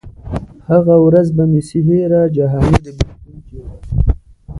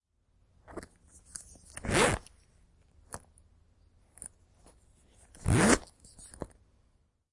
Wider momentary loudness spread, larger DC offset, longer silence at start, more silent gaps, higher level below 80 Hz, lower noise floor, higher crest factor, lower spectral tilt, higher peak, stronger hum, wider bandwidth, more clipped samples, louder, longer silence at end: second, 16 LU vs 23 LU; neither; second, 0.05 s vs 0.7 s; neither; first, -24 dBFS vs -48 dBFS; second, -35 dBFS vs -70 dBFS; second, 14 dB vs 30 dB; first, -9 dB/octave vs -4 dB/octave; first, 0 dBFS vs -6 dBFS; neither; about the same, 11 kHz vs 11.5 kHz; neither; first, -14 LUFS vs -28 LUFS; second, 0 s vs 0.85 s